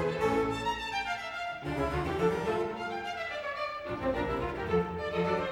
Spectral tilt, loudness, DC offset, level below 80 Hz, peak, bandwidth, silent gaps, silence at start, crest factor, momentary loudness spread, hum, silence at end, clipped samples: -6 dB/octave; -32 LUFS; under 0.1%; -48 dBFS; -16 dBFS; 19 kHz; none; 0 s; 16 dB; 6 LU; none; 0 s; under 0.1%